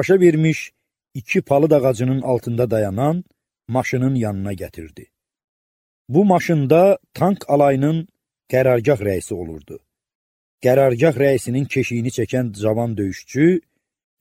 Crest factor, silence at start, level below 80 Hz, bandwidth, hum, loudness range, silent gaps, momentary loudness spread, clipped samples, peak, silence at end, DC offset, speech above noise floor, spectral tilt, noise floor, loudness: 18 dB; 0 s; -52 dBFS; 16.5 kHz; none; 5 LU; 5.44-6.05 s, 10.15-10.58 s; 13 LU; under 0.1%; 0 dBFS; 0.6 s; under 0.1%; over 73 dB; -7.5 dB/octave; under -90 dBFS; -18 LUFS